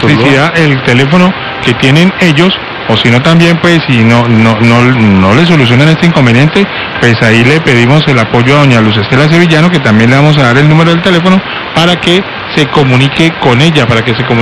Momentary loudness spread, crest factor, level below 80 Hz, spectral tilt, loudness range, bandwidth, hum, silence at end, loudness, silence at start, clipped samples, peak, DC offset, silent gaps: 4 LU; 6 dB; -36 dBFS; -6 dB/octave; 1 LU; 12 kHz; none; 0 s; -6 LUFS; 0 s; 3%; 0 dBFS; under 0.1%; none